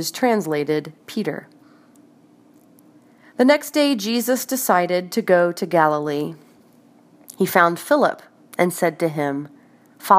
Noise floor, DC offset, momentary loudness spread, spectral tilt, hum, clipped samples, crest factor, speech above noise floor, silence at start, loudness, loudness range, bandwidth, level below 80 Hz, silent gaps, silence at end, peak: -52 dBFS; under 0.1%; 14 LU; -4.5 dB/octave; none; under 0.1%; 20 dB; 33 dB; 0 s; -20 LUFS; 6 LU; 15.5 kHz; -74 dBFS; none; 0 s; 0 dBFS